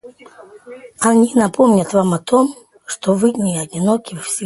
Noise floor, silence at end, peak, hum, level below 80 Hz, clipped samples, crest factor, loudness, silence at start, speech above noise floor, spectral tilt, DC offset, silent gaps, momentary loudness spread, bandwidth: -41 dBFS; 0 s; 0 dBFS; none; -58 dBFS; under 0.1%; 16 dB; -16 LUFS; 0.05 s; 26 dB; -5.5 dB/octave; under 0.1%; none; 9 LU; 12 kHz